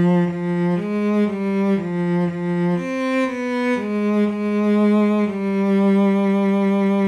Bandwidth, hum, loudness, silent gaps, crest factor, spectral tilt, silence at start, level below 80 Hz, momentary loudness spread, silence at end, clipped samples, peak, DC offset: 9.4 kHz; none; -19 LUFS; none; 10 dB; -8.5 dB/octave; 0 s; -60 dBFS; 5 LU; 0 s; under 0.1%; -8 dBFS; under 0.1%